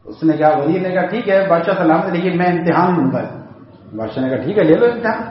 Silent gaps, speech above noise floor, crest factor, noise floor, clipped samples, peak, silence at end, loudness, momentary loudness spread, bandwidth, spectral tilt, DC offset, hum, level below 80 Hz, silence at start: none; 24 dB; 16 dB; -39 dBFS; under 0.1%; 0 dBFS; 0 s; -15 LUFS; 10 LU; 5.8 kHz; -6 dB/octave; under 0.1%; none; -56 dBFS; 0.05 s